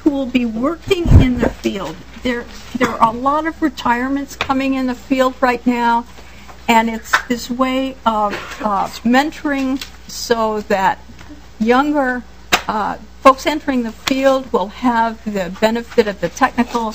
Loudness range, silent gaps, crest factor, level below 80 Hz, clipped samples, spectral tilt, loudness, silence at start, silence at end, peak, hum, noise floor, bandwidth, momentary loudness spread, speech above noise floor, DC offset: 2 LU; none; 16 dB; -30 dBFS; 0.2%; -5.5 dB/octave; -17 LUFS; 0 s; 0 s; 0 dBFS; none; -38 dBFS; 15.5 kHz; 9 LU; 21 dB; 1%